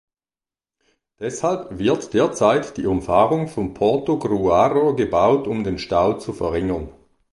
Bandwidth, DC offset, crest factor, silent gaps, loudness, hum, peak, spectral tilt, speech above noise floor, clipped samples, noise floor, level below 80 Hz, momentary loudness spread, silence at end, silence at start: 11.5 kHz; under 0.1%; 18 dB; none; -20 LUFS; none; -2 dBFS; -6 dB/octave; over 71 dB; under 0.1%; under -90 dBFS; -44 dBFS; 8 LU; 0.4 s; 1.2 s